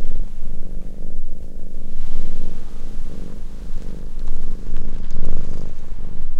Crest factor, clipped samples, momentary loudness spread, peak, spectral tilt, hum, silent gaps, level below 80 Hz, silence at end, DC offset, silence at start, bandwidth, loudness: 10 dB; under 0.1%; 6 LU; -2 dBFS; -7.5 dB/octave; none; none; -20 dBFS; 0 s; under 0.1%; 0 s; 0.8 kHz; -33 LUFS